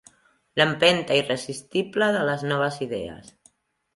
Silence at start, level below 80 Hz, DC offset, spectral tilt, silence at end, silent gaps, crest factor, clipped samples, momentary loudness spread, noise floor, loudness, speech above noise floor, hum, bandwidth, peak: 0.55 s; -60 dBFS; under 0.1%; -4.5 dB/octave; 0.65 s; none; 22 dB; under 0.1%; 12 LU; -61 dBFS; -23 LUFS; 38 dB; none; 11.5 kHz; -4 dBFS